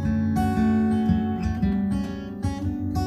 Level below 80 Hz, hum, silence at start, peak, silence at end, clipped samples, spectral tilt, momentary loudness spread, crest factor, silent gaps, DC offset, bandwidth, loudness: -36 dBFS; none; 0 s; -8 dBFS; 0 s; under 0.1%; -8 dB/octave; 8 LU; 14 dB; none; under 0.1%; 12.5 kHz; -24 LUFS